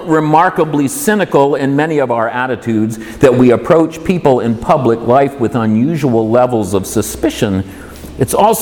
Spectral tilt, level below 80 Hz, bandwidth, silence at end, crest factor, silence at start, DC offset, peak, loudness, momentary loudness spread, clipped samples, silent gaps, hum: -6 dB/octave; -40 dBFS; 19 kHz; 0 s; 12 dB; 0 s; under 0.1%; 0 dBFS; -13 LUFS; 6 LU; under 0.1%; none; none